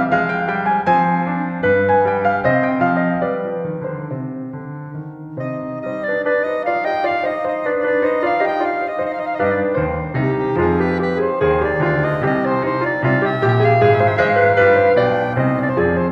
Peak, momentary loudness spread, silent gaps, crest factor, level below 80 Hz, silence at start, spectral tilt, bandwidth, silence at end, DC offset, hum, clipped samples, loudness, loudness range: -2 dBFS; 12 LU; none; 14 dB; -44 dBFS; 0 s; -9 dB/octave; 6.6 kHz; 0 s; under 0.1%; none; under 0.1%; -17 LUFS; 8 LU